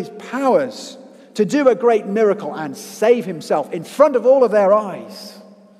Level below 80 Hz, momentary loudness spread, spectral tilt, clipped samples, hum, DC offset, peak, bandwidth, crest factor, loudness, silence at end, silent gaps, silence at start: -74 dBFS; 19 LU; -5.5 dB/octave; under 0.1%; none; under 0.1%; 0 dBFS; 14.5 kHz; 18 dB; -17 LUFS; 0.35 s; none; 0 s